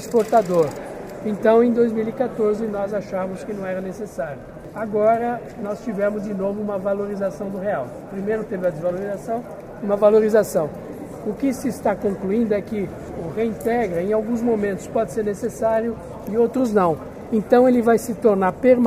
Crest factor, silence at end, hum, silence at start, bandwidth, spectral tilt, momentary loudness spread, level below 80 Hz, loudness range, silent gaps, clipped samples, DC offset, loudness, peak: 18 dB; 0 s; none; 0 s; 15.5 kHz; -7 dB/octave; 13 LU; -50 dBFS; 5 LU; none; under 0.1%; under 0.1%; -21 LUFS; -2 dBFS